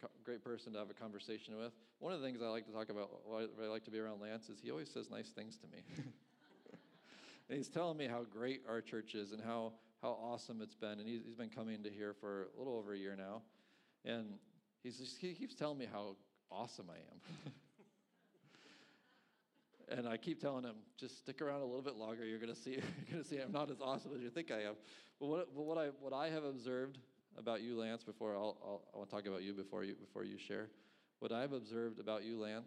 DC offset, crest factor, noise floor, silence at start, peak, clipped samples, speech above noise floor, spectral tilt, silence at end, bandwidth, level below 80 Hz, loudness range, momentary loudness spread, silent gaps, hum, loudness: under 0.1%; 20 dB; -79 dBFS; 0 s; -28 dBFS; under 0.1%; 33 dB; -5.5 dB/octave; 0 s; 12 kHz; under -90 dBFS; 6 LU; 12 LU; none; none; -47 LUFS